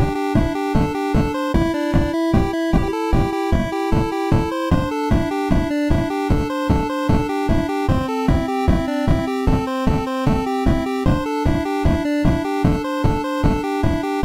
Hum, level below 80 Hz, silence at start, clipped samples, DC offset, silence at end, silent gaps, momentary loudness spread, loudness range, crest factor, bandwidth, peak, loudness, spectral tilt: none; -26 dBFS; 0 s; under 0.1%; under 0.1%; 0 s; none; 1 LU; 0 LU; 12 dB; 16 kHz; -6 dBFS; -20 LUFS; -7.5 dB/octave